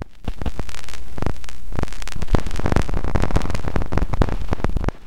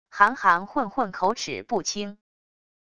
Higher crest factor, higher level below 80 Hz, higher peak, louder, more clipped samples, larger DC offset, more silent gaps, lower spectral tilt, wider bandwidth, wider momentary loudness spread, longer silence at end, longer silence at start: about the same, 22 dB vs 24 dB; first, -26 dBFS vs -62 dBFS; about the same, 0 dBFS vs -2 dBFS; about the same, -26 LUFS vs -24 LUFS; neither; first, 20% vs 0.3%; neither; first, -6.5 dB/octave vs -3 dB/octave; first, 16 kHz vs 11 kHz; about the same, 11 LU vs 11 LU; second, 0 s vs 0.75 s; about the same, 0 s vs 0.1 s